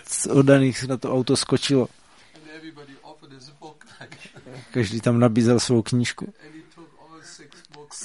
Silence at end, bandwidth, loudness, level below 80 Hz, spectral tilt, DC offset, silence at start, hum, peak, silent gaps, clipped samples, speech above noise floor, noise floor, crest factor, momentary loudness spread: 0 s; 11.5 kHz; -21 LUFS; -58 dBFS; -5.5 dB/octave; 0.1%; 0.1 s; none; -2 dBFS; none; under 0.1%; 29 dB; -49 dBFS; 22 dB; 26 LU